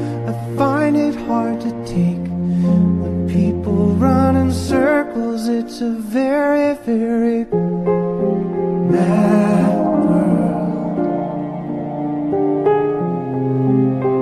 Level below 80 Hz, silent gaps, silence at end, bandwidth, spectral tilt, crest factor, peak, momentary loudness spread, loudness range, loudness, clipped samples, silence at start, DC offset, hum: -42 dBFS; none; 0 s; 12.5 kHz; -8.5 dB/octave; 14 dB; -2 dBFS; 8 LU; 2 LU; -17 LUFS; under 0.1%; 0 s; under 0.1%; none